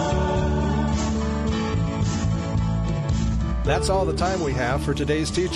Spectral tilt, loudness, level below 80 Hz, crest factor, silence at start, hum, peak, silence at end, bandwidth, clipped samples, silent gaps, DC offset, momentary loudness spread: -6 dB/octave; -23 LUFS; -28 dBFS; 14 dB; 0 s; none; -8 dBFS; 0 s; 11.5 kHz; under 0.1%; none; under 0.1%; 2 LU